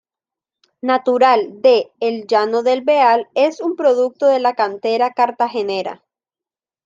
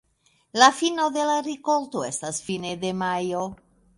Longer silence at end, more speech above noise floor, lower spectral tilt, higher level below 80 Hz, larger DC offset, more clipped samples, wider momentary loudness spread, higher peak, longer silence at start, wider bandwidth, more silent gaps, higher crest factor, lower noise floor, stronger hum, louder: first, 0.9 s vs 0.45 s; first, over 74 dB vs 42 dB; first, -4.5 dB/octave vs -3 dB/octave; second, -74 dBFS vs -64 dBFS; neither; neither; second, 8 LU vs 12 LU; about the same, -2 dBFS vs -2 dBFS; first, 0.85 s vs 0.55 s; second, 7.6 kHz vs 11.5 kHz; neither; second, 16 dB vs 22 dB; first, under -90 dBFS vs -65 dBFS; neither; first, -16 LUFS vs -24 LUFS